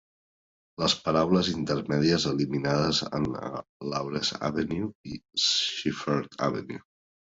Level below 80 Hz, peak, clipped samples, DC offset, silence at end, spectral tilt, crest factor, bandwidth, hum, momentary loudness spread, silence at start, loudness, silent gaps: -56 dBFS; -10 dBFS; under 0.1%; under 0.1%; 0.55 s; -4.5 dB/octave; 18 dB; 8 kHz; none; 12 LU; 0.8 s; -27 LUFS; 3.69-3.80 s, 4.95-5.04 s